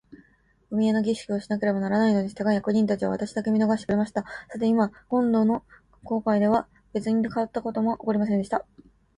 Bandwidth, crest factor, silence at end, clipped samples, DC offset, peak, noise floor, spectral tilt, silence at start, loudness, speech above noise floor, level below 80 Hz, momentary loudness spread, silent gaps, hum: 10.5 kHz; 16 dB; 0.55 s; under 0.1%; under 0.1%; -10 dBFS; -62 dBFS; -7.5 dB/octave; 0.1 s; -25 LUFS; 38 dB; -60 dBFS; 8 LU; none; none